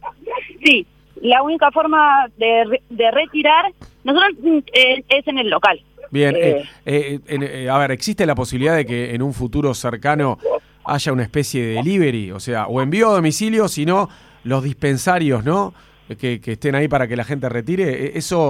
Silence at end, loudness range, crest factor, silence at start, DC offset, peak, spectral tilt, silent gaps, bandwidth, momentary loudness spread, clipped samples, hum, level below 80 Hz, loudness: 0 s; 5 LU; 18 dB; 0.05 s; under 0.1%; 0 dBFS; -5 dB/octave; none; 16 kHz; 11 LU; under 0.1%; none; -46 dBFS; -17 LUFS